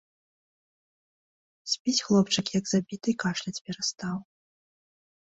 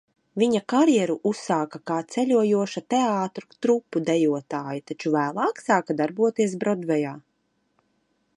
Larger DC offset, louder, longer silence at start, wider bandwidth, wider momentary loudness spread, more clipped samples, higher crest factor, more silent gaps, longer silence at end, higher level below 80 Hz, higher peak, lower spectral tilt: neither; second, -28 LUFS vs -24 LUFS; first, 1.65 s vs 0.35 s; second, 8.2 kHz vs 11 kHz; first, 12 LU vs 9 LU; neither; about the same, 20 dB vs 18 dB; first, 1.80-1.85 s, 3.61-3.65 s vs none; second, 1 s vs 1.15 s; first, -68 dBFS vs -74 dBFS; second, -10 dBFS vs -6 dBFS; second, -4 dB/octave vs -5.5 dB/octave